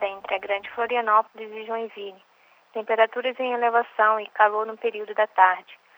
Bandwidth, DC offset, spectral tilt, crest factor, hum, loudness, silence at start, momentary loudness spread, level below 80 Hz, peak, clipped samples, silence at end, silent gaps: over 20 kHz; under 0.1%; -4.5 dB/octave; 22 dB; none; -23 LUFS; 0 s; 15 LU; -78 dBFS; -2 dBFS; under 0.1%; 0.2 s; none